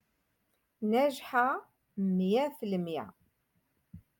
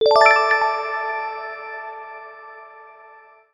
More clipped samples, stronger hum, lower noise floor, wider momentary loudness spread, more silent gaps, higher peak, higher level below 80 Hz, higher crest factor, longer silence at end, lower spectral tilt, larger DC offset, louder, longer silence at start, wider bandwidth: neither; neither; first, -77 dBFS vs -48 dBFS; second, 11 LU vs 26 LU; neither; second, -16 dBFS vs 0 dBFS; second, -74 dBFS vs -66 dBFS; about the same, 16 dB vs 20 dB; second, 0.2 s vs 0.65 s; first, -7 dB/octave vs -1 dB/octave; neither; second, -31 LUFS vs -18 LUFS; first, 0.8 s vs 0 s; first, 17.5 kHz vs 10 kHz